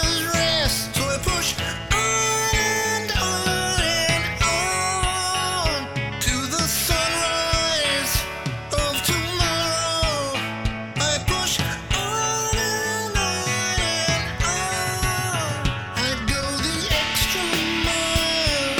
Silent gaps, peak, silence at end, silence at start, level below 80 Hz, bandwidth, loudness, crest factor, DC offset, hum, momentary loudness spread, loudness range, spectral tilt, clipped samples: none; -6 dBFS; 0 s; 0 s; -34 dBFS; 19.5 kHz; -21 LUFS; 16 dB; 0.2%; none; 5 LU; 2 LU; -2.5 dB/octave; under 0.1%